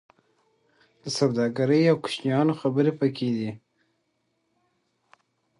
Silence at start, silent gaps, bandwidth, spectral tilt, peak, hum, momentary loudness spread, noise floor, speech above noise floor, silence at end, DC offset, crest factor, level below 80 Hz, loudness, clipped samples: 1.05 s; none; 11 kHz; -6.5 dB/octave; -8 dBFS; none; 12 LU; -74 dBFS; 50 dB; 2 s; under 0.1%; 18 dB; -70 dBFS; -24 LUFS; under 0.1%